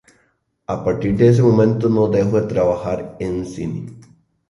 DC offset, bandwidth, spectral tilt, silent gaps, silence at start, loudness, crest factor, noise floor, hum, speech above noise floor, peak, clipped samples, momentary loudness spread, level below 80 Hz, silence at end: under 0.1%; 11 kHz; -9 dB/octave; none; 0.7 s; -18 LUFS; 16 dB; -64 dBFS; none; 47 dB; -2 dBFS; under 0.1%; 14 LU; -44 dBFS; 0.5 s